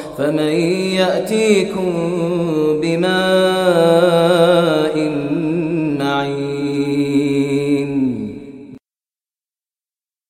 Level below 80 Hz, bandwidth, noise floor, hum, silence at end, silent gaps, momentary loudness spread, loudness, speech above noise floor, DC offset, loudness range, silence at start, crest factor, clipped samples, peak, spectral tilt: -52 dBFS; 15.5 kHz; under -90 dBFS; none; 1.55 s; none; 7 LU; -16 LUFS; over 75 dB; under 0.1%; 6 LU; 0 s; 16 dB; under 0.1%; -2 dBFS; -6 dB/octave